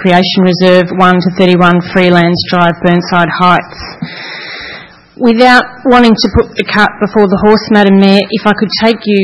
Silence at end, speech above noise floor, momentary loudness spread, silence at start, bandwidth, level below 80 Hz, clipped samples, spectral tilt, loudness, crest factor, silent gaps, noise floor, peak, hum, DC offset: 0 s; 22 dB; 15 LU; 0 s; 10.5 kHz; -34 dBFS; 2%; -6.5 dB/octave; -8 LUFS; 8 dB; none; -30 dBFS; 0 dBFS; none; 0.9%